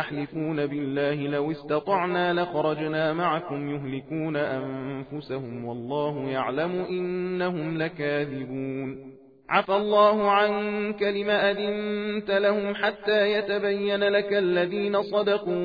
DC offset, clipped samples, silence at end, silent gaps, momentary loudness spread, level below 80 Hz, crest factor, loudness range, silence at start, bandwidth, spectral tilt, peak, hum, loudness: under 0.1%; under 0.1%; 0 s; none; 10 LU; -64 dBFS; 18 dB; 6 LU; 0 s; 5 kHz; -8 dB/octave; -8 dBFS; none; -26 LUFS